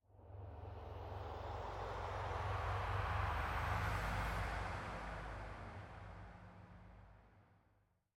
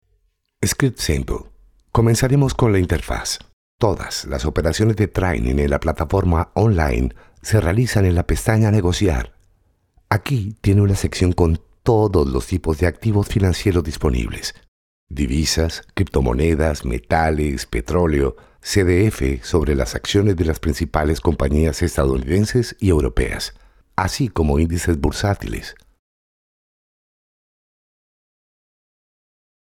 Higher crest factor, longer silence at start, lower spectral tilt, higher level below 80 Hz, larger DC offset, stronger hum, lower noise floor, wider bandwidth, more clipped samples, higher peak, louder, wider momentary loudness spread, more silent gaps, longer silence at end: about the same, 18 dB vs 18 dB; second, 0.1 s vs 0.6 s; about the same, -6 dB/octave vs -6 dB/octave; second, -52 dBFS vs -30 dBFS; neither; neither; first, -77 dBFS vs -64 dBFS; about the same, 16.5 kHz vs 17 kHz; neither; second, -26 dBFS vs 0 dBFS; second, -44 LUFS vs -19 LUFS; first, 19 LU vs 8 LU; second, none vs 3.53-3.78 s, 14.68-15.07 s; second, 0.75 s vs 3.95 s